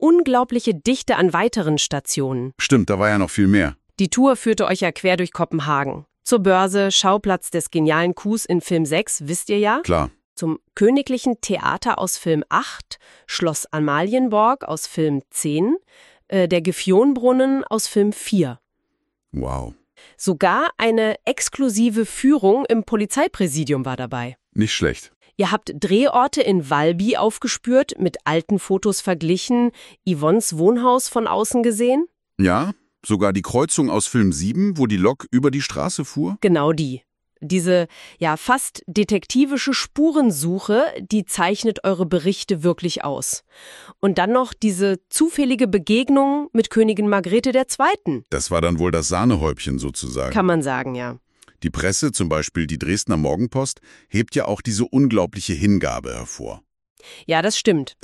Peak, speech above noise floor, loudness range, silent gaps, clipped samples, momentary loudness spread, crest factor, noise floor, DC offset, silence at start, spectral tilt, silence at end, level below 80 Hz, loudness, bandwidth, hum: -2 dBFS; 55 dB; 3 LU; 10.25-10.36 s, 25.16-25.21 s, 56.90-56.96 s; under 0.1%; 9 LU; 16 dB; -74 dBFS; under 0.1%; 0 s; -5 dB/octave; 0.15 s; -44 dBFS; -19 LUFS; 13.5 kHz; none